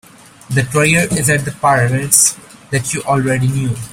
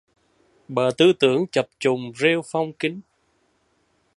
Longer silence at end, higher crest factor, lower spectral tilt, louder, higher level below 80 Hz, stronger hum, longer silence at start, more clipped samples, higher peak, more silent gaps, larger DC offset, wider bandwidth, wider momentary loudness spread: second, 0 s vs 1.15 s; about the same, 16 dB vs 20 dB; about the same, -4 dB/octave vs -5 dB/octave; first, -14 LUFS vs -21 LUFS; first, -44 dBFS vs -68 dBFS; neither; second, 0.5 s vs 0.7 s; neither; about the same, 0 dBFS vs -2 dBFS; neither; neither; first, 16.5 kHz vs 11.5 kHz; about the same, 10 LU vs 11 LU